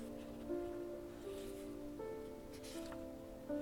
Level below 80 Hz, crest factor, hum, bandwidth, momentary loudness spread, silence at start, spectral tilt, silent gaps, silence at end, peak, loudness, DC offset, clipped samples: -62 dBFS; 16 dB; none; 18 kHz; 6 LU; 0 s; -5.5 dB/octave; none; 0 s; -32 dBFS; -48 LUFS; under 0.1%; under 0.1%